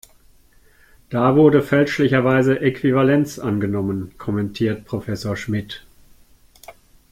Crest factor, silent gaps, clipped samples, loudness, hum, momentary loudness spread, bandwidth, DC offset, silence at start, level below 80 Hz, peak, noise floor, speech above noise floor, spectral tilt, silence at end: 18 dB; none; under 0.1%; -19 LUFS; none; 13 LU; 15.5 kHz; under 0.1%; 1.1 s; -50 dBFS; -2 dBFS; -52 dBFS; 34 dB; -7 dB/octave; 0.4 s